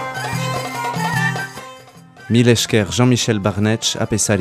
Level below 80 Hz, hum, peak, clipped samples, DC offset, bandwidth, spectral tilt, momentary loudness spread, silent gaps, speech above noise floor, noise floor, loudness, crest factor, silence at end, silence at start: -48 dBFS; none; 0 dBFS; under 0.1%; under 0.1%; 15.5 kHz; -4.5 dB/octave; 10 LU; none; 26 dB; -41 dBFS; -17 LUFS; 18 dB; 0 s; 0 s